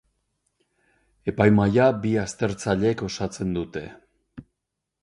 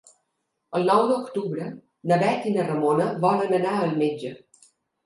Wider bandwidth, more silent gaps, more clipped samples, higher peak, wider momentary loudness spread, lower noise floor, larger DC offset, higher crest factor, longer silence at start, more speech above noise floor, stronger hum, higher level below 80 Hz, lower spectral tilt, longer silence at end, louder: about the same, 11 kHz vs 11.5 kHz; neither; neither; about the same, -4 dBFS vs -6 dBFS; about the same, 14 LU vs 12 LU; first, -83 dBFS vs -77 dBFS; neither; about the same, 20 dB vs 18 dB; first, 1.25 s vs 0.7 s; first, 60 dB vs 54 dB; neither; first, -50 dBFS vs -72 dBFS; about the same, -6.5 dB/octave vs -7 dB/octave; about the same, 0.6 s vs 0.7 s; about the same, -23 LUFS vs -23 LUFS